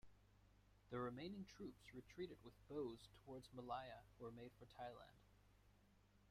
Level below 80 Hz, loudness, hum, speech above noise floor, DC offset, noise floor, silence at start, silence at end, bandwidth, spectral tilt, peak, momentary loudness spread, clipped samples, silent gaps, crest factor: -76 dBFS; -56 LUFS; 50 Hz at -70 dBFS; 20 dB; under 0.1%; -75 dBFS; 0.05 s; 0 s; 16 kHz; -6.5 dB/octave; -38 dBFS; 11 LU; under 0.1%; none; 20 dB